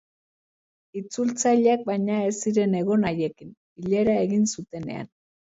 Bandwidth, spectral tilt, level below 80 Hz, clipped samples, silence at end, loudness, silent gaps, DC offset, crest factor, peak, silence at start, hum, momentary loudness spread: 8 kHz; -5.5 dB/octave; -60 dBFS; under 0.1%; 0.5 s; -24 LUFS; 3.57-3.76 s; under 0.1%; 16 dB; -10 dBFS; 0.95 s; none; 15 LU